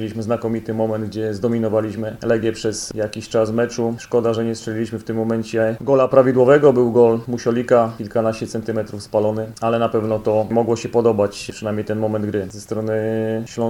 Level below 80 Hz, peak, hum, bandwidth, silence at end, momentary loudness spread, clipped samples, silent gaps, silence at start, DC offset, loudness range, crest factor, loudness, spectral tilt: -52 dBFS; 0 dBFS; none; 16 kHz; 0 s; 11 LU; under 0.1%; none; 0 s; under 0.1%; 5 LU; 18 dB; -19 LUFS; -6.5 dB/octave